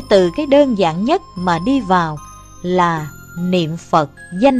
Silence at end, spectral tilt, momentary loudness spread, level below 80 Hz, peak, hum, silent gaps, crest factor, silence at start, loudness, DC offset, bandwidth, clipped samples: 0 s; -6.5 dB/octave; 11 LU; -42 dBFS; 0 dBFS; none; none; 16 dB; 0 s; -16 LUFS; under 0.1%; 14 kHz; under 0.1%